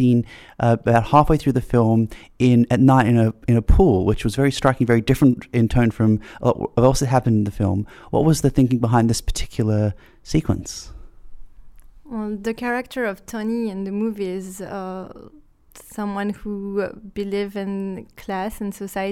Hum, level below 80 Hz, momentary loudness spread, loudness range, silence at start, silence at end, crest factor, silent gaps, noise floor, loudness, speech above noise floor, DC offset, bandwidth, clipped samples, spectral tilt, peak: none; -32 dBFS; 14 LU; 11 LU; 0 s; 0 s; 16 dB; none; -42 dBFS; -20 LUFS; 22 dB; under 0.1%; 15 kHz; under 0.1%; -7 dB/octave; -2 dBFS